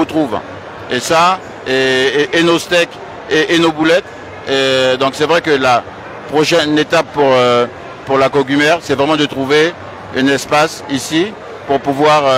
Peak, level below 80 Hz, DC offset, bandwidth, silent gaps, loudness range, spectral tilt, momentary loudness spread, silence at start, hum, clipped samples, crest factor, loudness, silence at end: 0 dBFS; -50 dBFS; under 0.1%; 16 kHz; none; 1 LU; -4 dB/octave; 10 LU; 0 s; none; under 0.1%; 14 dB; -13 LUFS; 0 s